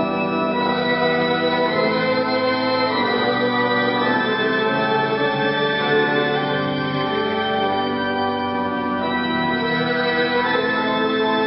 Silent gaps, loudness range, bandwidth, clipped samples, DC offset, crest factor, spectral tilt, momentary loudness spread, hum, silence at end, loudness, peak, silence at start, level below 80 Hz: none; 2 LU; 5.8 kHz; under 0.1%; under 0.1%; 14 dB; -10 dB/octave; 3 LU; none; 0 s; -19 LUFS; -6 dBFS; 0 s; -58 dBFS